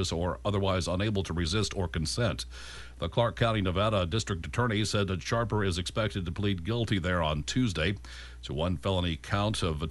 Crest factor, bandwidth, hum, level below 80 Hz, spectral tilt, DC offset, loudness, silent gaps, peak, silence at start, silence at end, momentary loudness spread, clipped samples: 18 dB; 11.5 kHz; none; -44 dBFS; -5 dB/octave; under 0.1%; -30 LUFS; none; -12 dBFS; 0 s; 0 s; 5 LU; under 0.1%